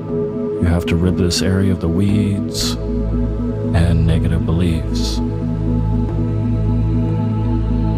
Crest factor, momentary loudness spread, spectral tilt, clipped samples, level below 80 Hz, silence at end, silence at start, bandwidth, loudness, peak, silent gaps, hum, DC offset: 14 dB; 5 LU; -6.5 dB/octave; under 0.1%; -24 dBFS; 0 s; 0 s; 15 kHz; -18 LUFS; -2 dBFS; none; none; under 0.1%